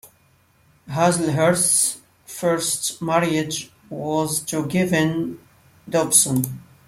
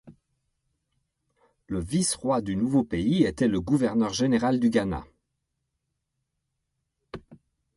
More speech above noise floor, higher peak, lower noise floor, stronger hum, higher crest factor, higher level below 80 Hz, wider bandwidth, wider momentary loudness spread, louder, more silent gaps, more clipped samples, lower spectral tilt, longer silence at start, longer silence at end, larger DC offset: second, 38 dB vs 56 dB; first, 0 dBFS vs -8 dBFS; second, -58 dBFS vs -80 dBFS; neither; about the same, 22 dB vs 20 dB; second, -58 dBFS vs -50 dBFS; first, 16.5 kHz vs 11.5 kHz; about the same, 14 LU vs 14 LU; first, -20 LUFS vs -25 LUFS; neither; neither; second, -3.5 dB/octave vs -5.5 dB/octave; about the same, 0.05 s vs 0.05 s; second, 0.25 s vs 0.4 s; neither